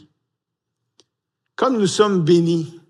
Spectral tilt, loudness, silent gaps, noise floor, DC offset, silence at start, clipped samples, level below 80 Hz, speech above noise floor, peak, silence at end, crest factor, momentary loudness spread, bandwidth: -6 dB/octave; -17 LUFS; none; -80 dBFS; under 0.1%; 1.6 s; under 0.1%; -72 dBFS; 63 dB; -2 dBFS; 0.15 s; 18 dB; 7 LU; 11.5 kHz